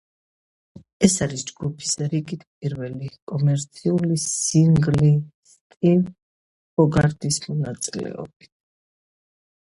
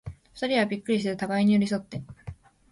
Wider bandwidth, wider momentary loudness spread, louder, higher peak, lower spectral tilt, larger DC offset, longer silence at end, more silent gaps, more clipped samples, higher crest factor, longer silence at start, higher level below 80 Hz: about the same, 11.5 kHz vs 11.5 kHz; second, 13 LU vs 21 LU; first, -22 LUFS vs -26 LUFS; first, 0 dBFS vs -12 dBFS; about the same, -5.5 dB/octave vs -6.5 dB/octave; neither; first, 1.45 s vs 0.4 s; first, 2.47-2.61 s, 3.22-3.27 s, 5.34-5.43 s, 5.61-5.70 s, 5.77-5.81 s, 6.22-6.77 s vs none; neither; first, 22 dB vs 16 dB; first, 1 s vs 0.05 s; about the same, -50 dBFS vs -54 dBFS